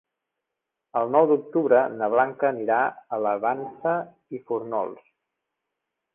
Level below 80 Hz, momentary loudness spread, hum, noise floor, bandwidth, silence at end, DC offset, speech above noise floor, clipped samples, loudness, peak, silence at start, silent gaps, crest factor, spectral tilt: -72 dBFS; 11 LU; none; -84 dBFS; 3.6 kHz; 1.2 s; under 0.1%; 61 dB; under 0.1%; -24 LUFS; -6 dBFS; 0.95 s; none; 20 dB; -10 dB/octave